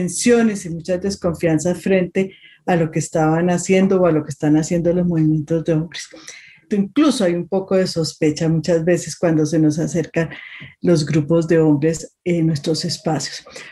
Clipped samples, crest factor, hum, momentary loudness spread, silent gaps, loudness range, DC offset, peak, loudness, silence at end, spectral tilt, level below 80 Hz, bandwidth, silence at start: under 0.1%; 14 dB; none; 10 LU; none; 2 LU; under 0.1%; -4 dBFS; -18 LUFS; 0 s; -6 dB/octave; -50 dBFS; 12.5 kHz; 0 s